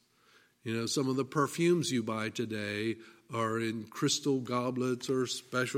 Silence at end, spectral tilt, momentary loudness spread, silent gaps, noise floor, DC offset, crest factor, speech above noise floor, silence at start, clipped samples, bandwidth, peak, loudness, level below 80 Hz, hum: 0 s; -4.5 dB/octave; 8 LU; none; -65 dBFS; under 0.1%; 16 dB; 33 dB; 0.65 s; under 0.1%; 16 kHz; -16 dBFS; -32 LUFS; -76 dBFS; none